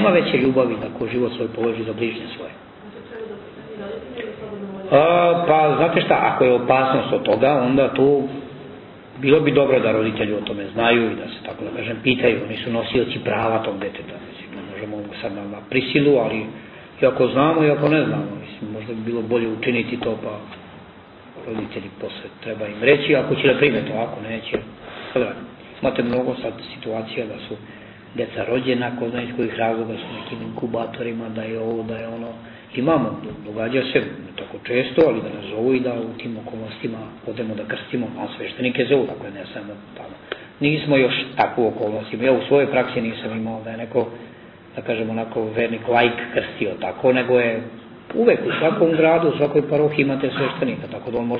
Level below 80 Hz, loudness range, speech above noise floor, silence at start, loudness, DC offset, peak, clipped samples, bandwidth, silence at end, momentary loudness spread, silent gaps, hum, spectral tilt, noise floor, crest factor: -54 dBFS; 8 LU; 23 dB; 0 s; -20 LUFS; under 0.1%; -2 dBFS; under 0.1%; 5.2 kHz; 0 s; 17 LU; none; none; -9.5 dB/octave; -43 dBFS; 18 dB